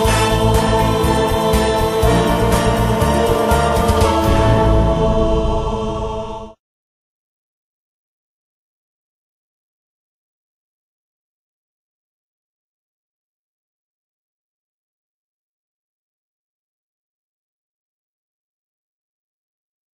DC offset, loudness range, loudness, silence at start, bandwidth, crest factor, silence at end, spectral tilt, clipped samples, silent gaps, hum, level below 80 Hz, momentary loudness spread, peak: under 0.1%; 12 LU; -15 LUFS; 0 s; 15 kHz; 18 dB; 13.4 s; -5.5 dB/octave; under 0.1%; none; none; -26 dBFS; 8 LU; 0 dBFS